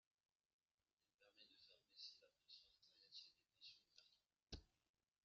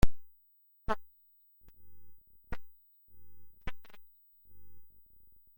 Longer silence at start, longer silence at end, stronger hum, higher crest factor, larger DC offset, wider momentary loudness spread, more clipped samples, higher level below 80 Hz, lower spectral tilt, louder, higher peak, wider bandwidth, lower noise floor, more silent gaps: first, 1.2 s vs 0 s; first, 0.45 s vs 0 s; neither; about the same, 28 dB vs 24 dB; neither; second, 8 LU vs 22 LU; neither; second, -78 dBFS vs -44 dBFS; second, -2 dB/octave vs -6 dB/octave; second, -64 LUFS vs -43 LUFS; second, -40 dBFS vs -10 dBFS; second, 7 kHz vs 16.5 kHz; first, under -90 dBFS vs -66 dBFS; neither